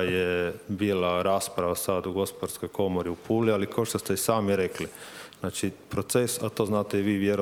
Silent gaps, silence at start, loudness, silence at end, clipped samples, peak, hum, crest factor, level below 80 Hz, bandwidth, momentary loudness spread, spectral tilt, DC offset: none; 0 s; -28 LUFS; 0 s; under 0.1%; -8 dBFS; none; 20 dB; -58 dBFS; over 20 kHz; 9 LU; -5 dB/octave; under 0.1%